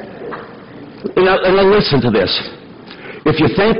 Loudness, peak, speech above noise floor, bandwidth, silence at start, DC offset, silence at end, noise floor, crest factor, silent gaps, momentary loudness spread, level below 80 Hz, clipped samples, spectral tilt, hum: -13 LUFS; -4 dBFS; 22 dB; 6 kHz; 0 s; under 0.1%; 0 s; -35 dBFS; 10 dB; none; 23 LU; -40 dBFS; under 0.1%; -8.5 dB/octave; none